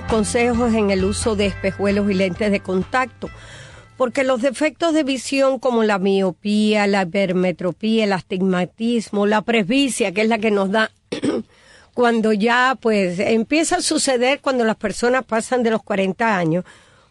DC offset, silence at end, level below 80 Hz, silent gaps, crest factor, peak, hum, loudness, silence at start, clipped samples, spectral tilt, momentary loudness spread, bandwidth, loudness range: under 0.1%; 0.5 s; -44 dBFS; none; 14 dB; -4 dBFS; none; -19 LUFS; 0 s; under 0.1%; -4.5 dB/octave; 5 LU; 12.5 kHz; 3 LU